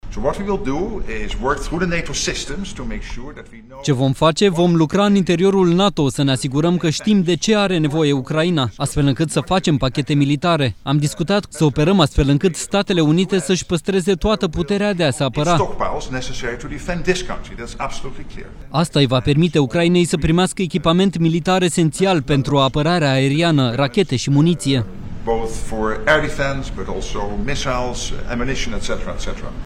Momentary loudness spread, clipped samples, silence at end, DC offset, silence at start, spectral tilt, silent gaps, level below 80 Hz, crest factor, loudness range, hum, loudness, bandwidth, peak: 12 LU; under 0.1%; 0 s; under 0.1%; 0.05 s; -5.5 dB/octave; none; -32 dBFS; 14 dB; 6 LU; none; -18 LUFS; 13 kHz; -2 dBFS